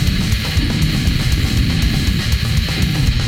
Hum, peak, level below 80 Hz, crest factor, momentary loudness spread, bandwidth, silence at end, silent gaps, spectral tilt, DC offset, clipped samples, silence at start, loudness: none; -2 dBFS; -20 dBFS; 12 dB; 1 LU; 17 kHz; 0 s; none; -5 dB/octave; under 0.1%; under 0.1%; 0 s; -17 LUFS